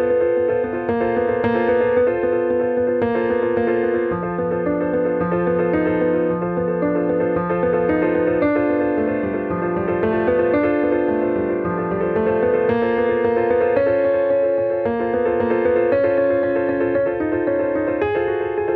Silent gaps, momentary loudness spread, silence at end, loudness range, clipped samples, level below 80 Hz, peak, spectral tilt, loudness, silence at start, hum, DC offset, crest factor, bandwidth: none; 4 LU; 0 s; 2 LU; under 0.1%; -48 dBFS; -6 dBFS; -10.5 dB/octave; -19 LUFS; 0 s; none; under 0.1%; 12 dB; 4.6 kHz